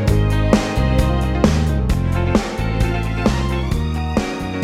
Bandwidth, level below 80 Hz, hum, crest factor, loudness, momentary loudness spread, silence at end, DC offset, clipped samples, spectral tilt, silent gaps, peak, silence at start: 15 kHz; -22 dBFS; none; 16 dB; -19 LUFS; 5 LU; 0 s; under 0.1%; under 0.1%; -6.5 dB/octave; none; -2 dBFS; 0 s